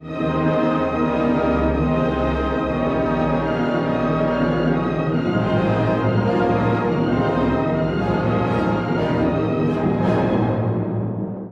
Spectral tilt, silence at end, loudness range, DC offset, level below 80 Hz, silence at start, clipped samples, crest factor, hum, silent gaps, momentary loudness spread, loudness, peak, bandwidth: -9 dB/octave; 0 s; 1 LU; under 0.1%; -36 dBFS; 0 s; under 0.1%; 12 dB; none; none; 2 LU; -20 LUFS; -8 dBFS; 7.6 kHz